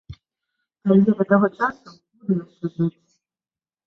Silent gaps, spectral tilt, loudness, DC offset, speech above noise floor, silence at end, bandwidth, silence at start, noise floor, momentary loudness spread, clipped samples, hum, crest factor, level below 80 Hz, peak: none; -10 dB/octave; -21 LUFS; under 0.1%; over 70 dB; 0.95 s; 5.8 kHz; 0.1 s; under -90 dBFS; 11 LU; under 0.1%; none; 20 dB; -58 dBFS; -2 dBFS